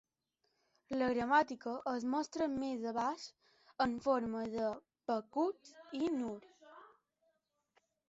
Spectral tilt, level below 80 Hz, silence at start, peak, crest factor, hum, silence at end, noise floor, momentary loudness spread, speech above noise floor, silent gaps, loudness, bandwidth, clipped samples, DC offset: -3.5 dB/octave; -72 dBFS; 0.9 s; -18 dBFS; 22 dB; none; 1.2 s; -84 dBFS; 15 LU; 47 dB; none; -37 LUFS; 8 kHz; under 0.1%; under 0.1%